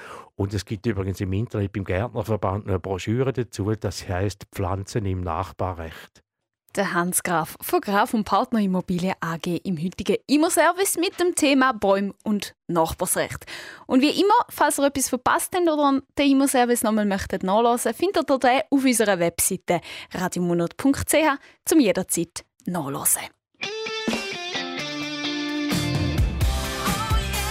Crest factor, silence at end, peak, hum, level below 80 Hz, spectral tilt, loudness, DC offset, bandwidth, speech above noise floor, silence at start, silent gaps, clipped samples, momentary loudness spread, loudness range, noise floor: 16 dB; 0 s; -8 dBFS; none; -40 dBFS; -4.5 dB/octave; -23 LUFS; under 0.1%; 16 kHz; 44 dB; 0 s; none; under 0.1%; 9 LU; 6 LU; -66 dBFS